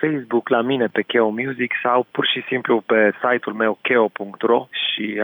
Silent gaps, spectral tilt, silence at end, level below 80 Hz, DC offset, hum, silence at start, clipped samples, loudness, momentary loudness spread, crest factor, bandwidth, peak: none; -8 dB/octave; 0 s; -76 dBFS; under 0.1%; none; 0 s; under 0.1%; -19 LUFS; 5 LU; 14 dB; over 20 kHz; -4 dBFS